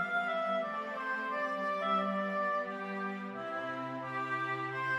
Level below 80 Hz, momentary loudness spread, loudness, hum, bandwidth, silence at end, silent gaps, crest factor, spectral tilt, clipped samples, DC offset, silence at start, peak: -82 dBFS; 6 LU; -35 LUFS; none; 13 kHz; 0 s; none; 14 dB; -6 dB/octave; under 0.1%; under 0.1%; 0 s; -20 dBFS